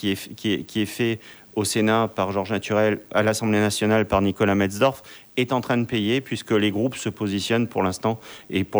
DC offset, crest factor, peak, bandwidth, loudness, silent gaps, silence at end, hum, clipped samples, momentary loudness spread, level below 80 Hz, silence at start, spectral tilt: under 0.1%; 16 dB; -6 dBFS; over 20 kHz; -23 LUFS; none; 0 s; none; under 0.1%; 7 LU; -52 dBFS; 0 s; -5 dB/octave